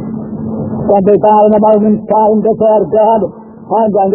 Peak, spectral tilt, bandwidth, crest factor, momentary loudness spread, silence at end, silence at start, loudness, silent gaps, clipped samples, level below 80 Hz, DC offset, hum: 0 dBFS; -12.5 dB/octave; 3 kHz; 10 dB; 12 LU; 0 s; 0 s; -10 LUFS; none; 0.1%; -42 dBFS; under 0.1%; none